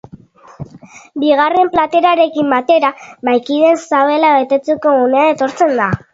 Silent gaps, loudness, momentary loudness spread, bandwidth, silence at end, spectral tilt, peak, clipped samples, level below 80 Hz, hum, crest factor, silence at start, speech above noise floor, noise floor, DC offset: none; -13 LUFS; 9 LU; 7.8 kHz; 0.15 s; -6 dB/octave; 0 dBFS; under 0.1%; -50 dBFS; none; 14 dB; 0.6 s; 27 dB; -39 dBFS; under 0.1%